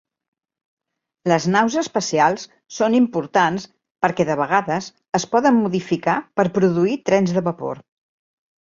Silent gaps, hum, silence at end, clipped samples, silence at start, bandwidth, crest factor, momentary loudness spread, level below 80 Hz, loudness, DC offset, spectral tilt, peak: 3.91-3.95 s; none; 0.85 s; under 0.1%; 1.25 s; 7.6 kHz; 18 dB; 10 LU; -60 dBFS; -19 LUFS; under 0.1%; -5.5 dB/octave; -2 dBFS